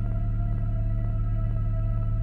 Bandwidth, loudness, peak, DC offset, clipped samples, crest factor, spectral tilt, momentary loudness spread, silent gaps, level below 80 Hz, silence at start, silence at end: 3.1 kHz; -29 LUFS; -16 dBFS; under 0.1%; under 0.1%; 8 dB; -11.5 dB/octave; 0 LU; none; -28 dBFS; 0 s; 0 s